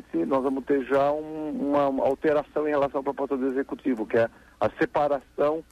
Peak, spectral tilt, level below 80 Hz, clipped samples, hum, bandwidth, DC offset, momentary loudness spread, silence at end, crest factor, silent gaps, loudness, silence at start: -12 dBFS; -7.5 dB/octave; -58 dBFS; under 0.1%; none; 12 kHz; under 0.1%; 6 LU; 0.1 s; 14 dB; none; -26 LUFS; 0.15 s